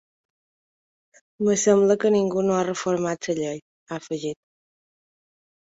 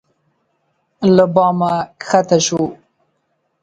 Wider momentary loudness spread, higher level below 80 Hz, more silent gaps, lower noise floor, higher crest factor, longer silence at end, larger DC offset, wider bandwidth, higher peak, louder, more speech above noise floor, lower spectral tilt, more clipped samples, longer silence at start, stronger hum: first, 17 LU vs 9 LU; second, -66 dBFS vs -58 dBFS; first, 3.62-3.87 s vs none; first, under -90 dBFS vs -67 dBFS; about the same, 18 dB vs 16 dB; first, 1.25 s vs 0.9 s; neither; second, 8 kHz vs 9.2 kHz; second, -6 dBFS vs 0 dBFS; second, -23 LUFS vs -15 LUFS; first, over 68 dB vs 53 dB; about the same, -5 dB/octave vs -5 dB/octave; neither; first, 1.4 s vs 1 s; neither